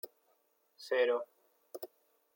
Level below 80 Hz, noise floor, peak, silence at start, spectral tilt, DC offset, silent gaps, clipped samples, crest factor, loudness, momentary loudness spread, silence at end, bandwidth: under -90 dBFS; -75 dBFS; -20 dBFS; 0.05 s; -1.5 dB/octave; under 0.1%; none; under 0.1%; 20 dB; -33 LUFS; 21 LU; 0.5 s; 17 kHz